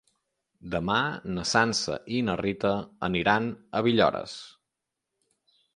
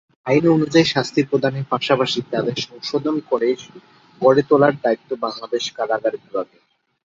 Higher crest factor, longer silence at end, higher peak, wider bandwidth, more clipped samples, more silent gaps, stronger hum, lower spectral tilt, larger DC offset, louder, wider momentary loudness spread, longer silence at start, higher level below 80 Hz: about the same, 22 dB vs 18 dB; first, 1.25 s vs 0.6 s; second, -6 dBFS vs -2 dBFS; first, 11 kHz vs 7.8 kHz; neither; neither; neither; about the same, -4.5 dB/octave vs -5.5 dB/octave; neither; second, -27 LUFS vs -19 LUFS; about the same, 9 LU vs 11 LU; first, 0.65 s vs 0.25 s; about the same, -56 dBFS vs -60 dBFS